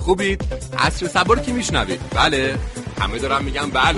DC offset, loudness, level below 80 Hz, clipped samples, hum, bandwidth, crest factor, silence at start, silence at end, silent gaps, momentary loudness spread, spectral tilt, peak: under 0.1%; -20 LUFS; -30 dBFS; under 0.1%; none; 11.5 kHz; 18 dB; 0 s; 0 s; none; 8 LU; -4 dB/octave; -2 dBFS